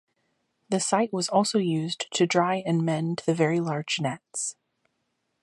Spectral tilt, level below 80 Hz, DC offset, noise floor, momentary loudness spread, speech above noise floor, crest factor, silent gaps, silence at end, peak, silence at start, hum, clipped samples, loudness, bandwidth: -4.5 dB/octave; -74 dBFS; under 0.1%; -77 dBFS; 8 LU; 51 dB; 20 dB; none; 0.9 s; -8 dBFS; 0.7 s; none; under 0.1%; -26 LUFS; 11.5 kHz